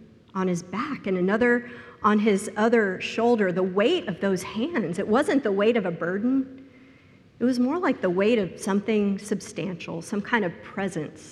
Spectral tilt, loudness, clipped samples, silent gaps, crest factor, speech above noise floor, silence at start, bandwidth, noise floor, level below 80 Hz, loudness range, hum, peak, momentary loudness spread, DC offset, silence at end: -6 dB/octave; -25 LUFS; under 0.1%; none; 18 dB; 29 dB; 0 s; 12.5 kHz; -53 dBFS; -64 dBFS; 3 LU; none; -8 dBFS; 9 LU; under 0.1%; 0 s